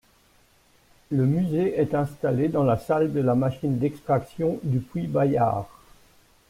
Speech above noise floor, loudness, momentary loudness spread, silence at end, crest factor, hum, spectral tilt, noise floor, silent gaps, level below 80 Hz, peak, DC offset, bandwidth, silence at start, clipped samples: 36 dB; -24 LUFS; 5 LU; 0.8 s; 14 dB; none; -9.5 dB/octave; -60 dBFS; none; -54 dBFS; -10 dBFS; under 0.1%; 15 kHz; 1.1 s; under 0.1%